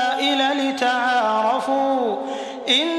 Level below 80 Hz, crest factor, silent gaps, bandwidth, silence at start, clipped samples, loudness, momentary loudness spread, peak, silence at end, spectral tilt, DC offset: -74 dBFS; 14 dB; none; 13 kHz; 0 s; under 0.1%; -20 LUFS; 7 LU; -6 dBFS; 0 s; -2 dB/octave; under 0.1%